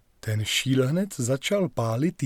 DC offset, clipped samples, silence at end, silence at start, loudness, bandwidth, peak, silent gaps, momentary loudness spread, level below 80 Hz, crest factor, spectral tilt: under 0.1%; under 0.1%; 0 s; 0.25 s; -25 LUFS; 18 kHz; -10 dBFS; none; 4 LU; -58 dBFS; 14 dB; -5 dB/octave